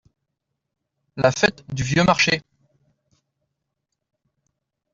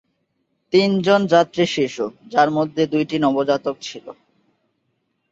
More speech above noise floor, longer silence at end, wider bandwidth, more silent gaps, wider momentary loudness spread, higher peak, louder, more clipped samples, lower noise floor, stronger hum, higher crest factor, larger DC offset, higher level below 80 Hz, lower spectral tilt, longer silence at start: first, 60 dB vs 52 dB; first, 2.55 s vs 1.2 s; about the same, 7.8 kHz vs 8 kHz; neither; about the same, 10 LU vs 12 LU; about the same, -2 dBFS vs -2 dBFS; about the same, -19 LUFS vs -19 LUFS; neither; first, -80 dBFS vs -71 dBFS; neither; about the same, 22 dB vs 18 dB; neither; first, -52 dBFS vs -62 dBFS; about the same, -4.5 dB/octave vs -5.5 dB/octave; first, 1.15 s vs 0.75 s